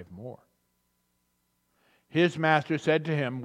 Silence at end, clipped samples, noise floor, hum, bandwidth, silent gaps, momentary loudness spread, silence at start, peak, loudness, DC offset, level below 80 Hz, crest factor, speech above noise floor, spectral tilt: 0 s; under 0.1%; -75 dBFS; 60 Hz at -60 dBFS; 10 kHz; none; 19 LU; 0 s; -6 dBFS; -26 LUFS; under 0.1%; -76 dBFS; 24 dB; 47 dB; -6.5 dB/octave